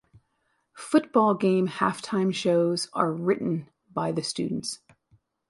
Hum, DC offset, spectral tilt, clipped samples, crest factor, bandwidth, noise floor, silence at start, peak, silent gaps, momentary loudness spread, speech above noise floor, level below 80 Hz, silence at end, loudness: none; under 0.1%; -5.5 dB/octave; under 0.1%; 20 dB; 11.5 kHz; -73 dBFS; 0.75 s; -6 dBFS; none; 11 LU; 49 dB; -68 dBFS; 0.75 s; -26 LUFS